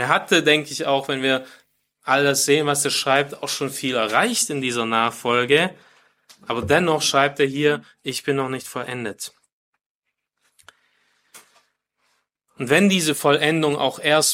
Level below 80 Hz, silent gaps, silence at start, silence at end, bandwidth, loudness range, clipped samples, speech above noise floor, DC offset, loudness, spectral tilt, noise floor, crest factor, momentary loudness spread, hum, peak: -62 dBFS; 9.52-9.73 s, 9.86-10.02 s; 0 s; 0 s; 16.5 kHz; 10 LU; under 0.1%; 59 dB; under 0.1%; -20 LUFS; -3 dB/octave; -79 dBFS; 20 dB; 12 LU; none; -2 dBFS